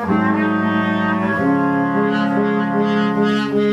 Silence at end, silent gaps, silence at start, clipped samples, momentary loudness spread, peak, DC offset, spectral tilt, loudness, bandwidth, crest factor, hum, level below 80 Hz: 0 s; none; 0 s; under 0.1%; 1 LU; -4 dBFS; under 0.1%; -7.5 dB/octave; -17 LUFS; 7.8 kHz; 12 dB; none; -54 dBFS